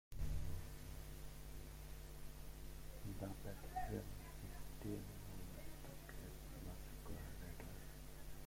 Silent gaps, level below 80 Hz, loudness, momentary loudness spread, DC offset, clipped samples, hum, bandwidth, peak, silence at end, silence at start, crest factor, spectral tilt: none; -54 dBFS; -53 LUFS; 8 LU; under 0.1%; under 0.1%; none; 16.5 kHz; -32 dBFS; 0 s; 0.1 s; 16 dB; -5.5 dB/octave